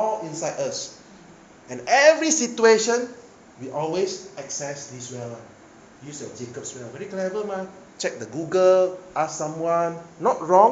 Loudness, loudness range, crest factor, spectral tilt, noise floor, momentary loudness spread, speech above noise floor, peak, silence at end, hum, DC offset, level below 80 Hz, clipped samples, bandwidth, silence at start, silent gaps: -22 LUFS; 12 LU; 20 dB; -3 dB/octave; -48 dBFS; 19 LU; 25 dB; -2 dBFS; 0 s; none; under 0.1%; -68 dBFS; under 0.1%; 9.2 kHz; 0 s; none